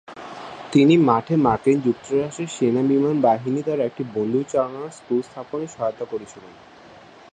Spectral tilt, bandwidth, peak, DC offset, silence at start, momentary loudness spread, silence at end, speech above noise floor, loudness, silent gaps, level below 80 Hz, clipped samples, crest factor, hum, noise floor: -7 dB/octave; 9.4 kHz; -4 dBFS; under 0.1%; 0.1 s; 16 LU; 0.8 s; 25 dB; -21 LUFS; none; -58 dBFS; under 0.1%; 18 dB; none; -46 dBFS